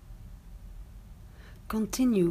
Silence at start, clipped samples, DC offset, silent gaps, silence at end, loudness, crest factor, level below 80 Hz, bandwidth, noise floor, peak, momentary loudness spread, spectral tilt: 0.05 s; under 0.1%; under 0.1%; none; 0 s; -29 LUFS; 16 dB; -48 dBFS; 15.5 kHz; -48 dBFS; -16 dBFS; 24 LU; -6 dB/octave